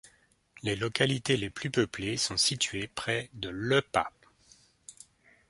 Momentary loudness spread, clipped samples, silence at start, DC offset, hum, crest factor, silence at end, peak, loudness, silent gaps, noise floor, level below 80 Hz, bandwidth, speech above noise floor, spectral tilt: 11 LU; under 0.1%; 0.05 s; under 0.1%; none; 24 dB; 0.6 s; -8 dBFS; -30 LUFS; none; -65 dBFS; -60 dBFS; 11.5 kHz; 34 dB; -3.5 dB/octave